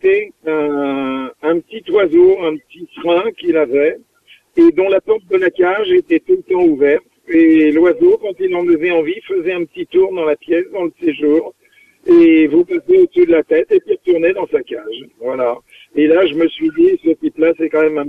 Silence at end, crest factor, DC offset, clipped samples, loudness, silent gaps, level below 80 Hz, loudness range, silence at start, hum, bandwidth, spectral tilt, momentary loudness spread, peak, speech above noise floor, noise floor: 0 s; 12 dB; under 0.1%; under 0.1%; -14 LUFS; none; -56 dBFS; 3 LU; 0.05 s; none; 3.9 kHz; -7.5 dB/octave; 10 LU; -2 dBFS; 38 dB; -51 dBFS